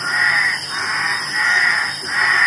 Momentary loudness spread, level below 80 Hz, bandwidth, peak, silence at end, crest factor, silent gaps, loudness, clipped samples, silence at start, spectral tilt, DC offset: 6 LU; -62 dBFS; 11.5 kHz; -4 dBFS; 0 s; 14 dB; none; -16 LUFS; under 0.1%; 0 s; -0.5 dB/octave; under 0.1%